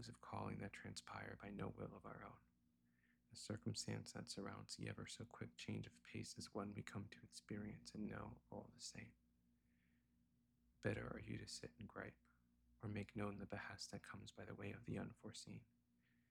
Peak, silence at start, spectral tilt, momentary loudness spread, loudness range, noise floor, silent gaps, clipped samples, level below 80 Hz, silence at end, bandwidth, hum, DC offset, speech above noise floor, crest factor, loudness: -30 dBFS; 0 s; -5 dB/octave; 9 LU; 3 LU; -81 dBFS; none; under 0.1%; -74 dBFS; 0.65 s; 16 kHz; 60 Hz at -70 dBFS; under 0.1%; 28 dB; 24 dB; -53 LUFS